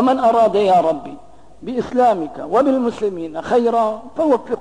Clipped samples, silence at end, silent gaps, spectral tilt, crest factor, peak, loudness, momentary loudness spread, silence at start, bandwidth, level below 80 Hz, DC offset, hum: under 0.1%; 0 s; none; -6.5 dB/octave; 12 dB; -6 dBFS; -17 LUFS; 12 LU; 0 s; 10.5 kHz; -54 dBFS; 0.5%; none